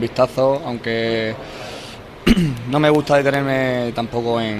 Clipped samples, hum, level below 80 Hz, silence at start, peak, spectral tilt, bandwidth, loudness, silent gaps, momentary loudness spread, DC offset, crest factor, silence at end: under 0.1%; none; -38 dBFS; 0 s; -2 dBFS; -6.5 dB/octave; 15 kHz; -18 LUFS; none; 15 LU; under 0.1%; 18 dB; 0 s